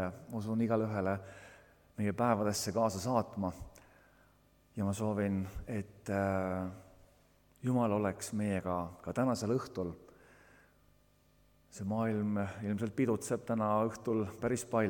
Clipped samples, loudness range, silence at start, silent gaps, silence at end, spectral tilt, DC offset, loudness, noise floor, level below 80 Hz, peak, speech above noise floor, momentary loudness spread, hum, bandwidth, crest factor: under 0.1%; 4 LU; 0 s; none; 0 s; -6.5 dB/octave; under 0.1%; -35 LUFS; -68 dBFS; -62 dBFS; -16 dBFS; 33 dB; 10 LU; 50 Hz at -65 dBFS; 19 kHz; 20 dB